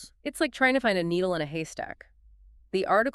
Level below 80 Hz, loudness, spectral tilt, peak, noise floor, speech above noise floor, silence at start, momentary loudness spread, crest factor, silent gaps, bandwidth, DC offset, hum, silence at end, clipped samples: -58 dBFS; -27 LUFS; -5 dB/octave; -8 dBFS; -55 dBFS; 28 dB; 0 s; 15 LU; 20 dB; none; 13.5 kHz; under 0.1%; none; 0.05 s; under 0.1%